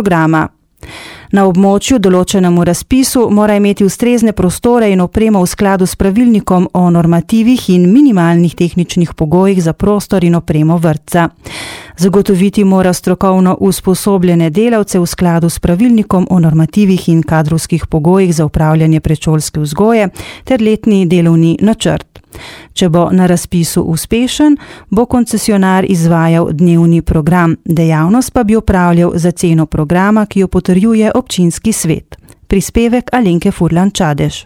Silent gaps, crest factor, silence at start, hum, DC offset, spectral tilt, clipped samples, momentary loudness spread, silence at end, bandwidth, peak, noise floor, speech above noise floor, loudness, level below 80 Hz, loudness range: none; 10 dB; 0 s; none; under 0.1%; -6.5 dB/octave; 0.4%; 5 LU; 0.05 s; 16 kHz; 0 dBFS; -31 dBFS; 22 dB; -10 LUFS; -30 dBFS; 2 LU